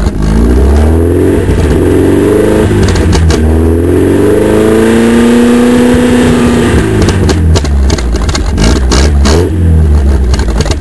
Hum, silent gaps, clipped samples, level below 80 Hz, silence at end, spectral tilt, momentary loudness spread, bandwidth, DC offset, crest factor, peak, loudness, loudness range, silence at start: none; none; 2%; -12 dBFS; 0 s; -6.5 dB/octave; 4 LU; 11 kHz; 5%; 6 dB; 0 dBFS; -7 LUFS; 2 LU; 0 s